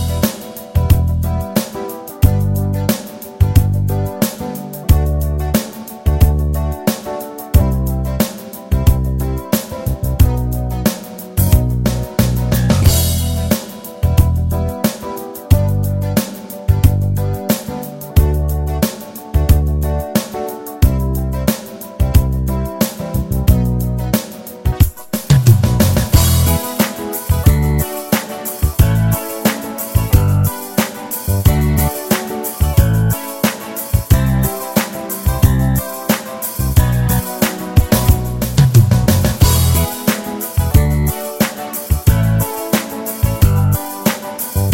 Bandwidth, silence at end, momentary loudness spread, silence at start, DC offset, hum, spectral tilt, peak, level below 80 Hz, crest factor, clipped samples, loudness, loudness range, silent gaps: 16.5 kHz; 0 s; 9 LU; 0 s; under 0.1%; none; -6 dB/octave; 0 dBFS; -20 dBFS; 14 dB; under 0.1%; -16 LUFS; 4 LU; none